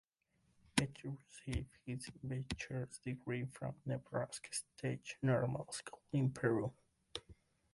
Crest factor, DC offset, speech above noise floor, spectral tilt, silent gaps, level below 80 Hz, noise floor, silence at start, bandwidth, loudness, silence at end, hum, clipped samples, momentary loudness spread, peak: 24 dB; under 0.1%; 38 dB; -5.5 dB/octave; none; -60 dBFS; -79 dBFS; 0.75 s; 11.5 kHz; -42 LUFS; 0.4 s; none; under 0.1%; 12 LU; -18 dBFS